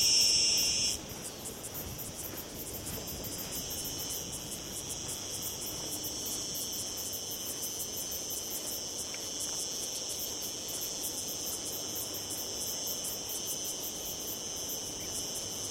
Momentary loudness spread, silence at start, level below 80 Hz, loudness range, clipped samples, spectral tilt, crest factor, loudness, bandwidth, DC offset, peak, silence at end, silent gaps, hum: 7 LU; 0 s; -58 dBFS; 3 LU; under 0.1%; -1 dB/octave; 22 dB; -33 LUFS; 16.5 kHz; under 0.1%; -14 dBFS; 0 s; none; none